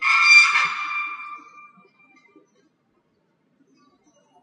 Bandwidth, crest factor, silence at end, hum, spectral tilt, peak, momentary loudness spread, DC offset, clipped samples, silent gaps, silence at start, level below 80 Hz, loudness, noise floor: 10 kHz; 22 dB; 3.05 s; none; 3 dB/octave; -2 dBFS; 26 LU; under 0.1%; under 0.1%; none; 0 s; -88 dBFS; -15 LUFS; -67 dBFS